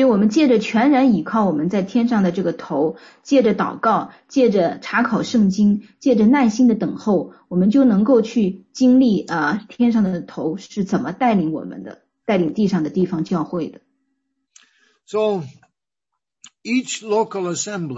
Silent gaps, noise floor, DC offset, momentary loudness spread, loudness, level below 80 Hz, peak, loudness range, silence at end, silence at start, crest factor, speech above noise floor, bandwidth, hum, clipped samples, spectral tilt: none; -81 dBFS; under 0.1%; 11 LU; -18 LUFS; -58 dBFS; -4 dBFS; 8 LU; 0 s; 0 s; 14 dB; 63 dB; 7.8 kHz; none; under 0.1%; -6.5 dB/octave